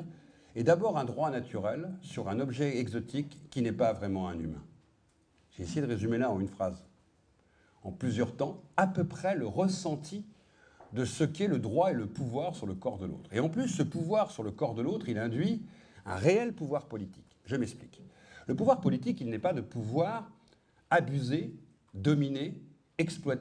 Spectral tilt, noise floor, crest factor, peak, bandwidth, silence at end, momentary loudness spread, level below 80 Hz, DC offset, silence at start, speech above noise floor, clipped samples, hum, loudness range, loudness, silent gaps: -6.5 dB/octave; -69 dBFS; 22 dB; -10 dBFS; 10.5 kHz; 0 s; 14 LU; -64 dBFS; under 0.1%; 0 s; 37 dB; under 0.1%; none; 3 LU; -33 LUFS; none